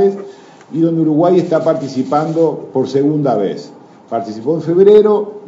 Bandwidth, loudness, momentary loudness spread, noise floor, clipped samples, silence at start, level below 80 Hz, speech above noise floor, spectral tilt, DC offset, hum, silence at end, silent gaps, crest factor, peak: 7.6 kHz; -14 LUFS; 14 LU; -34 dBFS; 0.2%; 0 s; -64 dBFS; 21 dB; -8.5 dB/octave; under 0.1%; none; 0 s; none; 14 dB; 0 dBFS